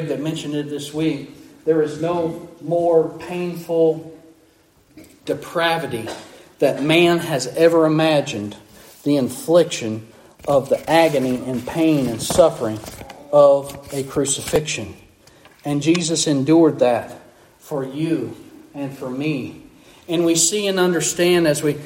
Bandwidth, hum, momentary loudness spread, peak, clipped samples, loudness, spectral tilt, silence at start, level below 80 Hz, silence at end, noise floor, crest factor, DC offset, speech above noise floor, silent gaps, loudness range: 16.5 kHz; none; 15 LU; -2 dBFS; under 0.1%; -19 LUFS; -4.5 dB/octave; 0 s; -54 dBFS; 0 s; -55 dBFS; 18 dB; under 0.1%; 36 dB; none; 5 LU